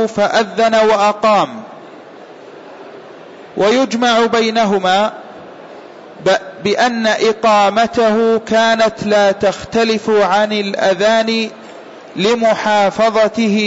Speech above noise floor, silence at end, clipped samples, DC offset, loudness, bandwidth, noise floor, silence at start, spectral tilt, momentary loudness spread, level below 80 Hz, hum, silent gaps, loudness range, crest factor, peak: 23 dB; 0 s; under 0.1%; under 0.1%; -13 LUFS; 8 kHz; -36 dBFS; 0 s; -4 dB/octave; 20 LU; -54 dBFS; none; none; 4 LU; 12 dB; -4 dBFS